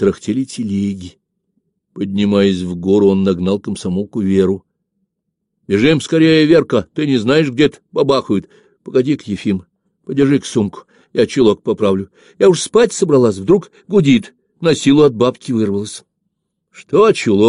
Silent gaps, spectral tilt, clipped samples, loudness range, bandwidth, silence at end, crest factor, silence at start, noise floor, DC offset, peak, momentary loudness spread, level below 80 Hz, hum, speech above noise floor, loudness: none; -6 dB/octave; under 0.1%; 4 LU; 11 kHz; 0 s; 14 dB; 0 s; -74 dBFS; under 0.1%; -2 dBFS; 9 LU; -50 dBFS; none; 60 dB; -15 LUFS